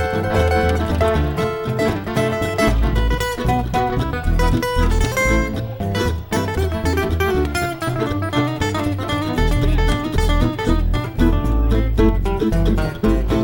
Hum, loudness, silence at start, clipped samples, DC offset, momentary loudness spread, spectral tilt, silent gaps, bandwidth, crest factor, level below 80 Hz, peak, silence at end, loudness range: none; -19 LUFS; 0 s; under 0.1%; under 0.1%; 4 LU; -6 dB/octave; none; 18.5 kHz; 16 dB; -22 dBFS; -2 dBFS; 0 s; 2 LU